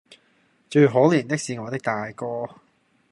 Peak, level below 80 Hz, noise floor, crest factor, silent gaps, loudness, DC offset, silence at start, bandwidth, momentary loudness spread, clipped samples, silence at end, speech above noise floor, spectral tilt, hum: -4 dBFS; -68 dBFS; -63 dBFS; 20 dB; none; -22 LUFS; under 0.1%; 0.7 s; 11.5 kHz; 14 LU; under 0.1%; 0.65 s; 41 dB; -6.5 dB/octave; none